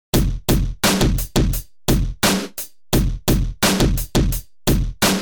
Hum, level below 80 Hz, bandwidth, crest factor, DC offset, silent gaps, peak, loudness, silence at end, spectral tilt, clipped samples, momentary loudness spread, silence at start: none; -24 dBFS; over 20 kHz; 14 dB; 0.7%; none; -4 dBFS; -20 LUFS; 0 s; -4.5 dB/octave; under 0.1%; 6 LU; 0.15 s